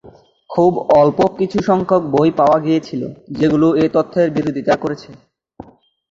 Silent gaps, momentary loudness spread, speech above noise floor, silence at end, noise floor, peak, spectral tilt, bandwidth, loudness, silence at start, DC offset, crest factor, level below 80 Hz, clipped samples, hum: none; 11 LU; 26 dB; 0.5 s; -41 dBFS; -2 dBFS; -8 dB/octave; 7.6 kHz; -15 LUFS; 0.05 s; under 0.1%; 14 dB; -50 dBFS; under 0.1%; none